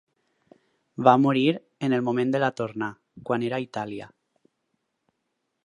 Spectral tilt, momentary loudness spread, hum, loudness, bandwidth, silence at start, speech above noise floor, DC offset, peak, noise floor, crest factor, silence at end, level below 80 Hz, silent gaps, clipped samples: -7 dB/octave; 16 LU; none; -25 LUFS; 10 kHz; 1 s; 55 dB; under 0.1%; -2 dBFS; -78 dBFS; 24 dB; 1.6 s; -72 dBFS; none; under 0.1%